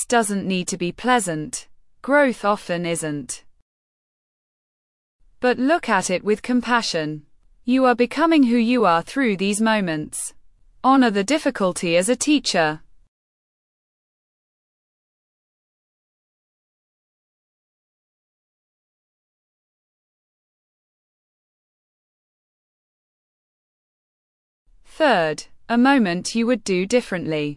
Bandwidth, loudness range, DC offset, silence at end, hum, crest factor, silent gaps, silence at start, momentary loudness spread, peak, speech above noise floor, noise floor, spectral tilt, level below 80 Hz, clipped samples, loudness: 12 kHz; 7 LU; under 0.1%; 0 s; none; 18 dB; 3.62-5.19 s, 13.08-24.66 s; 0 s; 11 LU; -4 dBFS; over 70 dB; under -90 dBFS; -4 dB/octave; -58 dBFS; under 0.1%; -20 LUFS